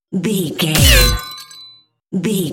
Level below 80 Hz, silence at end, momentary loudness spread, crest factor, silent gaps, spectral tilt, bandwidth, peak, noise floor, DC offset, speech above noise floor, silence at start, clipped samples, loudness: -22 dBFS; 0 s; 20 LU; 16 dB; none; -3.5 dB/octave; 17.5 kHz; 0 dBFS; -45 dBFS; under 0.1%; 31 dB; 0.1 s; under 0.1%; -14 LUFS